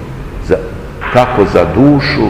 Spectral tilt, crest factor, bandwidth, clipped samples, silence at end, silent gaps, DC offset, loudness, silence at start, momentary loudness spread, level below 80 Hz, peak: -7.5 dB/octave; 12 dB; 12 kHz; 2%; 0 s; none; under 0.1%; -10 LUFS; 0 s; 16 LU; -26 dBFS; 0 dBFS